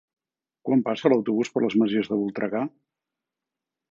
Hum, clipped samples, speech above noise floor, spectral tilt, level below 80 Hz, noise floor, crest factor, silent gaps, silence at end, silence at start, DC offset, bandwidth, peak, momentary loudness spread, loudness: none; under 0.1%; 64 dB; -6.5 dB/octave; -72 dBFS; -88 dBFS; 20 dB; none; 1.25 s; 0.65 s; under 0.1%; 7.4 kHz; -6 dBFS; 8 LU; -24 LUFS